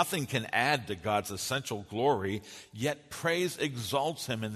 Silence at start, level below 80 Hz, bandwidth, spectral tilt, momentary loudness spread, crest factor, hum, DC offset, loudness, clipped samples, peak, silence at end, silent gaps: 0 s; -66 dBFS; 13.5 kHz; -4 dB/octave; 7 LU; 20 dB; none; under 0.1%; -32 LUFS; under 0.1%; -12 dBFS; 0 s; none